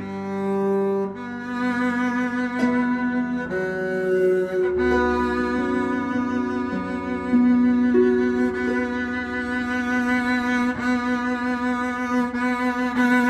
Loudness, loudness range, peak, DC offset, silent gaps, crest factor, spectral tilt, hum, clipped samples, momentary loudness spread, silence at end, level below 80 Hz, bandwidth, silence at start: -22 LUFS; 2 LU; -8 dBFS; under 0.1%; none; 14 dB; -6.5 dB/octave; none; under 0.1%; 7 LU; 0 s; -48 dBFS; 8.8 kHz; 0 s